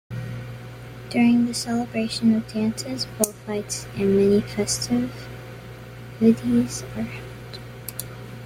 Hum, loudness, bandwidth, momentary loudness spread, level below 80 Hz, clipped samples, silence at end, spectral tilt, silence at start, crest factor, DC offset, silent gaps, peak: none; -23 LUFS; 16.5 kHz; 19 LU; -50 dBFS; under 0.1%; 0 s; -5 dB/octave; 0.1 s; 24 dB; under 0.1%; none; 0 dBFS